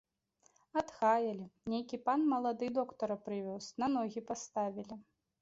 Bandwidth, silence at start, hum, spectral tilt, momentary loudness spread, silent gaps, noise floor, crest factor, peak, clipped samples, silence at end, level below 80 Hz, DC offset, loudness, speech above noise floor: 7.6 kHz; 0.75 s; none; -5 dB/octave; 11 LU; none; -74 dBFS; 18 dB; -18 dBFS; under 0.1%; 0.4 s; -74 dBFS; under 0.1%; -36 LUFS; 38 dB